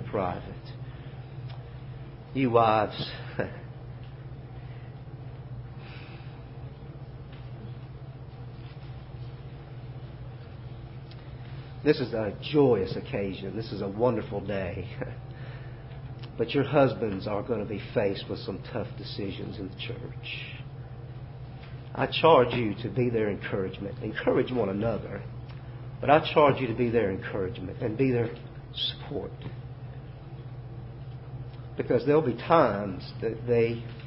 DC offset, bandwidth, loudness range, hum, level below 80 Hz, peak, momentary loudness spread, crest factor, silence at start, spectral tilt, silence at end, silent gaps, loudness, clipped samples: under 0.1%; 5.8 kHz; 16 LU; none; -50 dBFS; -6 dBFS; 19 LU; 24 dB; 0 s; -10.5 dB/octave; 0 s; none; -28 LUFS; under 0.1%